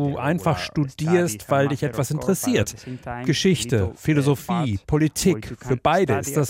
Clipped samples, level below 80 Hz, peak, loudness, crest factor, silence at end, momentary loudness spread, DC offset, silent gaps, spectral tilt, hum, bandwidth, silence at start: under 0.1%; -46 dBFS; -6 dBFS; -22 LUFS; 16 dB; 0 s; 6 LU; under 0.1%; none; -5.5 dB/octave; none; 16.5 kHz; 0 s